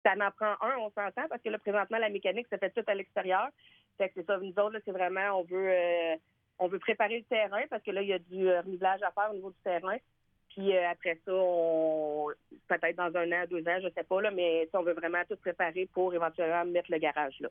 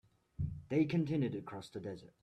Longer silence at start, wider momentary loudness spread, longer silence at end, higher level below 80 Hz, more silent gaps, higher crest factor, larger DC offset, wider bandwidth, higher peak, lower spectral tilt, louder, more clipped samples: second, 0.05 s vs 0.4 s; second, 6 LU vs 13 LU; second, 0 s vs 0.15 s; second, -78 dBFS vs -60 dBFS; neither; about the same, 18 dB vs 16 dB; neither; second, 3.7 kHz vs 10.5 kHz; first, -14 dBFS vs -22 dBFS; about the same, -8 dB/octave vs -8.5 dB/octave; first, -32 LUFS vs -38 LUFS; neither